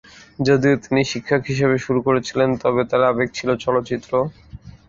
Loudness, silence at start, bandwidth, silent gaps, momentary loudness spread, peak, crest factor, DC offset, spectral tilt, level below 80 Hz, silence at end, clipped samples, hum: -19 LUFS; 0.4 s; 7.6 kHz; none; 6 LU; -2 dBFS; 16 dB; under 0.1%; -6 dB/octave; -48 dBFS; 0.2 s; under 0.1%; none